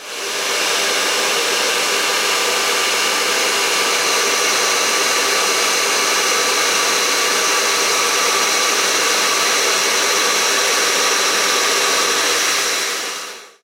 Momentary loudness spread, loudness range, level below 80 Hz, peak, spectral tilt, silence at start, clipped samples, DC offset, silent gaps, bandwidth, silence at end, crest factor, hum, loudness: 2 LU; 1 LU; -70 dBFS; -4 dBFS; 1 dB/octave; 0 s; under 0.1%; under 0.1%; none; 16 kHz; 0.15 s; 14 dB; none; -14 LUFS